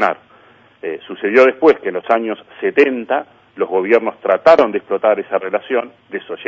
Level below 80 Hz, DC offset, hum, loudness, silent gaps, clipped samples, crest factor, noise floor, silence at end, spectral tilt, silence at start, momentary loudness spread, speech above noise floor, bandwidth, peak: -60 dBFS; under 0.1%; none; -15 LUFS; none; under 0.1%; 16 dB; -48 dBFS; 0 s; -6 dB/octave; 0 s; 16 LU; 33 dB; 7.4 kHz; 0 dBFS